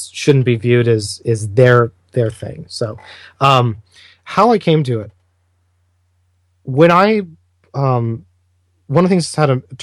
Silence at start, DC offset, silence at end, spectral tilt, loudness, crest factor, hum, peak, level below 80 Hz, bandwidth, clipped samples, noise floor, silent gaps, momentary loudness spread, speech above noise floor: 0 s; under 0.1%; 0 s; -6.5 dB/octave; -15 LUFS; 16 dB; none; 0 dBFS; -54 dBFS; 12 kHz; under 0.1%; -61 dBFS; none; 17 LU; 46 dB